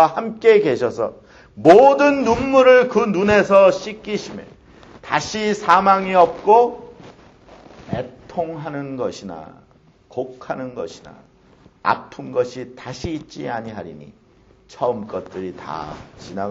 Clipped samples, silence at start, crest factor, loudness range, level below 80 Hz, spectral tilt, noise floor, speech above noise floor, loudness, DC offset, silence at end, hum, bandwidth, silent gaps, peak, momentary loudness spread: under 0.1%; 0 s; 18 dB; 15 LU; -50 dBFS; -5.5 dB/octave; -53 dBFS; 35 dB; -17 LUFS; under 0.1%; 0 s; none; 8 kHz; none; 0 dBFS; 21 LU